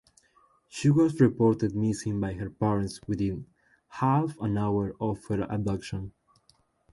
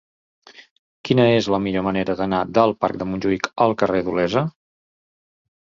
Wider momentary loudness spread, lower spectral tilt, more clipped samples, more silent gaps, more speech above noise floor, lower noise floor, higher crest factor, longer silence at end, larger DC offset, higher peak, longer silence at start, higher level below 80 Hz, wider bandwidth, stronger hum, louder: first, 13 LU vs 7 LU; about the same, -7.5 dB/octave vs -6.5 dB/octave; neither; second, none vs 0.71-1.04 s; second, 40 dB vs over 71 dB; second, -66 dBFS vs under -90 dBFS; about the same, 20 dB vs 20 dB; second, 0.85 s vs 1.3 s; neither; second, -8 dBFS vs -2 dBFS; first, 0.75 s vs 0.6 s; about the same, -52 dBFS vs -52 dBFS; first, 11.5 kHz vs 7.6 kHz; neither; second, -28 LUFS vs -20 LUFS